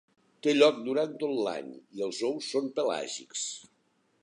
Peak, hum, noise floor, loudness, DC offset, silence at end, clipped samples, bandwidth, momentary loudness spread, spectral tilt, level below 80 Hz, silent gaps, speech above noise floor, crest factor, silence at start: -8 dBFS; none; -71 dBFS; -30 LUFS; under 0.1%; 0.6 s; under 0.1%; 11 kHz; 13 LU; -3 dB/octave; -86 dBFS; none; 42 dB; 22 dB; 0.45 s